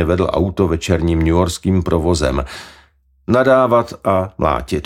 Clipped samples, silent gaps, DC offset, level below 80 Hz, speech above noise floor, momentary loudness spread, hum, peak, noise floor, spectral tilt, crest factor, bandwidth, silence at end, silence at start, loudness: under 0.1%; none; under 0.1%; -30 dBFS; 36 dB; 7 LU; none; 0 dBFS; -52 dBFS; -6.5 dB/octave; 14 dB; 15.5 kHz; 0 s; 0 s; -16 LUFS